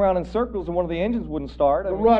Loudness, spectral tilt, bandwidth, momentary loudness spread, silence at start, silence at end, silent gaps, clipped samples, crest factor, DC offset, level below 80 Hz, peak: -24 LUFS; -9 dB/octave; 7.4 kHz; 5 LU; 0 s; 0 s; none; under 0.1%; 16 dB; under 0.1%; -38 dBFS; -6 dBFS